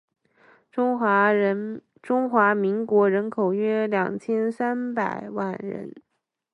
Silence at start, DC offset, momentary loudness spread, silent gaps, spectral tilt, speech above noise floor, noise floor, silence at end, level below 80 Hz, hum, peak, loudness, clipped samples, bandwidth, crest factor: 0.75 s; under 0.1%; 14 LU; none; -8 dB/octave; 35 dB; -58 dBFS; 0.55 s; -74 dBFS; none; -6 dBFS; -23 LUFS; under 0.1%; 8.4 kHz; 18 dB